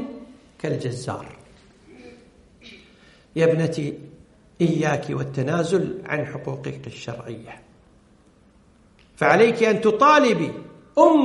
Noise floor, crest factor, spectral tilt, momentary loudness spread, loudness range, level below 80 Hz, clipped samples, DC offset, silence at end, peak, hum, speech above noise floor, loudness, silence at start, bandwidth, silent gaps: -55 dBFS; 22 dB; -6 dB/octave; 20 LU; 13 LU; -60 dBFS; under 0.1%; under 0.1%; 0 s; -2 dBFS; none; 35 dB; -21 LUFS; 0 s; 11.5 kHz; none